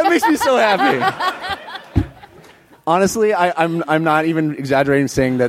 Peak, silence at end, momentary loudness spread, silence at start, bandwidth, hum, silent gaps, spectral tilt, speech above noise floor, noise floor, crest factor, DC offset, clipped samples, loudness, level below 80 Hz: 0 dBFS; 0 s; 10 LU; 0 s; 16.5 kHz; none; none; -5 dB/octave; 30 dB; -45 dBFS; 16 dB; under 0.1%; under 0.1%; -17 LUFS; -40 dBFS